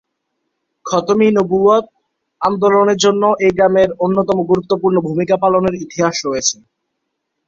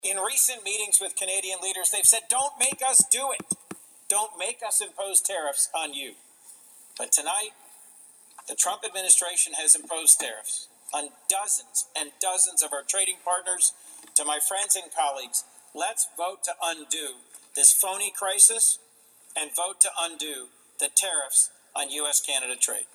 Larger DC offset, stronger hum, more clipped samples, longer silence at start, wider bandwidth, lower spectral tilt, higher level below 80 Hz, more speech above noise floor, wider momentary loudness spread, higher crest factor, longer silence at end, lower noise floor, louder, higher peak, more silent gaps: neither; neither; neither; first, 0.85 s vs 0.05 s; second, 7.6 kHz vs over 20 kHz; first, -4.5 dB/octave vs 1.5 dB/octave; first, -52 dBFS vs -84 dBFS; first, 60 dB vs 29 dB; second, 7 LU vs 14 LU; second, 14 dB vs 26 dB; first, 0.95 s vs 0.1 s; first, -73 dBFS vs -55 dBFS; first, -14 LUFS vs -22 LUFS; about the same, -2 dBFS vs -2 dBFS; neither